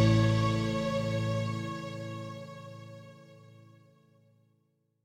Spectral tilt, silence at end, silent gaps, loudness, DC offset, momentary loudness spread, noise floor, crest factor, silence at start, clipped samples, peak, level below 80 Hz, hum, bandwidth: -7 dB/octave; 1.6 s; none; -31 LUFS; under 0.1%; 21 LU; -74 dBFS; 18 dB; 0 s; under 0.1%; -14 dBFS; -54 dBFS; none; 9.8 kHz